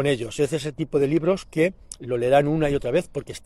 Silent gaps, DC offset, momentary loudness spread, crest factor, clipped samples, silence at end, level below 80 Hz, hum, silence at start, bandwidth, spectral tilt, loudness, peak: none; under 0.1%; 8 LU; 16 dB; under 0.1%; 0.05 s; -46 dBFS; none; 0 s; 13 kHz; -6 dB/octave; -23 LUFS; -8 dBFS